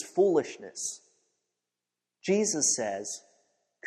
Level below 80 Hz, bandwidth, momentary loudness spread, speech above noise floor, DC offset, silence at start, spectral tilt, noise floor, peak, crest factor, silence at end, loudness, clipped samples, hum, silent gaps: -78 dBFS; 13 kHz; 14 LU; 60 dB; under 0.1%; 0 s; -3 dB/octave; -88 dBFS; -14 dBFS; 18 dB; 0 s; -28 LUFS; under 0.1%; 60 Hz at -65 dBFS; none